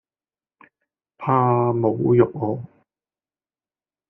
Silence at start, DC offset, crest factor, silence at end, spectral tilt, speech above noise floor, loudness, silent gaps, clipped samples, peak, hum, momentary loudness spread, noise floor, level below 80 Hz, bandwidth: 1.2 s; under 0.1%; 20 dB; 1.45 s; -10 dB/octave; over 71 dB; -20 LUFS; none; under 0.1%; -4 dBFS; none; 11 LU; under -90 dBFS; -60 dBFS; 3.3 kHz